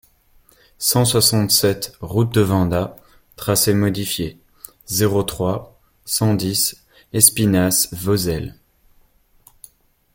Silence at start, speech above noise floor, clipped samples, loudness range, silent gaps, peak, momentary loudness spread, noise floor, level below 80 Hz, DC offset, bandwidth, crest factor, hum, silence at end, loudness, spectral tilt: 0.8 s; 37 dB; under 0.1%; 4 LU; none; 0 dBFS; 13 LU; -55 dBFS; -46 dBFS; under 0.1%; 17 kHz; 20 dB; none; 1.65 s; -18 LUFS; -4 dB/octave